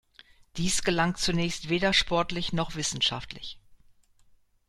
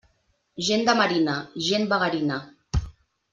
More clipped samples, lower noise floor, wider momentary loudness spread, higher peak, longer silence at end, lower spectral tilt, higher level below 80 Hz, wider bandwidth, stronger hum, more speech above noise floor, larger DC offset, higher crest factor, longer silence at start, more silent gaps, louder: neither; second, -61 dBFS vs -68 dBFS; first, 16 LU vs 11 LU; second, -10 dBFS vs -6 dBFS; first, 0.95 s vs 0.4 s; about the same, -3.5 dB/octave vs -4.5 dB/octave; second, -46 dBFS vs -40 dBFS; first, 13.5 kHz vs 9.6 kHz; neither; second, 33 dB vs 45 dB; neither; about the same, 20 dB vs 20 dB; about the same, 0.55 s vs 0.55 s; neither; second, -27 LUFS vs -24 LUFS